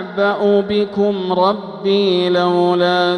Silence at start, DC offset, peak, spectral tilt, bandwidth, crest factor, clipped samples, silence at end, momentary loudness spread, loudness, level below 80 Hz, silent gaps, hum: 0 s; under 0.1%; -2 dBFS; -7 dB/octave; 9.8 kHz; 14 dB; under 0.1%; 0 s; 4 LU; -16 LUFS; -58 dBFS; none; none